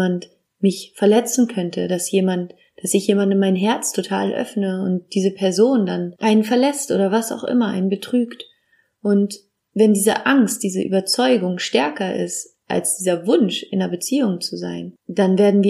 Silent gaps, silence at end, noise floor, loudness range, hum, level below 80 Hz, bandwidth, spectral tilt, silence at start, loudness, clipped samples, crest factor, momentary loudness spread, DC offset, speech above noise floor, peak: none; 0 s; -63 dBFS; 2 LU; none; -72 dBFS; 15.5 kHz; -5 dB/octave; 0 s; -19 LUFS; under 0.1%; 16 dB; 10 LU; under 0.1%; 44 dB; -2 dBFS